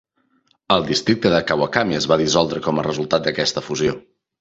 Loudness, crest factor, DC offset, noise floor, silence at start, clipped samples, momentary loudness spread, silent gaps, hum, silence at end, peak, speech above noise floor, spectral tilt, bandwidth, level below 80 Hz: -19 LUFS; 20 dB; under 0.1%; -63 dBFS; 0.7 s; under 0.1%; 5 LU; none; none; 0.4 s; 0 dBFS; 44 dB; -4.5 dB/octave; 8 kHz; -50 dBFS